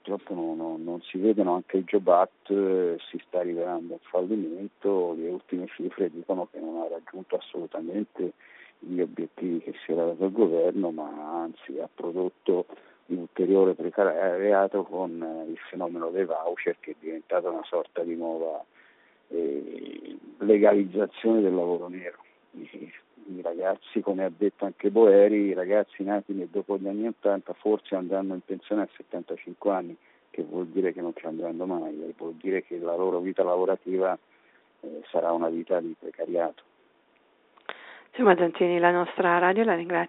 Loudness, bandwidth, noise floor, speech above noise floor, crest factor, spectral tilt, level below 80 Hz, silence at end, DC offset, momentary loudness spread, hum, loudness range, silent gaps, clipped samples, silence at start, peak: -27 LUFS; 4 kHz; -64 dBFS; 37 dB; 22 dB; -5 dB/octave; -80 dBFS; 0 s; under 0.1%; 15 LU; none; 8 LU; none; under 0.1%; 0.05 s; -6 dBFS